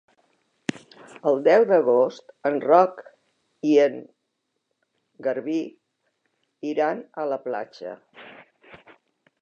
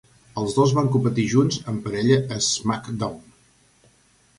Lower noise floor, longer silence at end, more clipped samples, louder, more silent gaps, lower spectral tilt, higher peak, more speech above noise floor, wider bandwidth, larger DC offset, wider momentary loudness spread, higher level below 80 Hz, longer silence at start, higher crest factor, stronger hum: first, -77 dBFS vs -59 dBFS; second, 0.65 s vs 1.2 s; neither; about the same, -23 LUFS vs -22 LUFS; neither; about the same, -6 dB/octave vs -5.5 dB/octave; about the same, -4 dBFS vs -4 dBFS; first, 56 dB vs 38 dB; second, 8.8 kHz vs 11.5 kHz; neither; first, 18 LU vs 10 LU; second, -80 dBFS vs -54 dBFS; first, 1.25 s vs 0.35 s; about the same, 22 dB vs 18 dB; neither